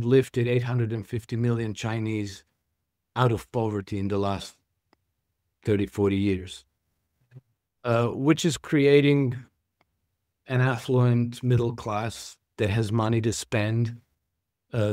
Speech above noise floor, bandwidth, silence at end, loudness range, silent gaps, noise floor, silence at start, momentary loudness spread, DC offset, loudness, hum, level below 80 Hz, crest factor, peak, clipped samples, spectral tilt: 57 dB; 14.5 kHz; 0 s; 6 LU; none; -81 dBFS; 0 s; 12 LU; under 0.1%; -26 LUFS; none; -56 dBFS; 20 dB; -6 dBFS; under 0.1%; -6.5 dB/octave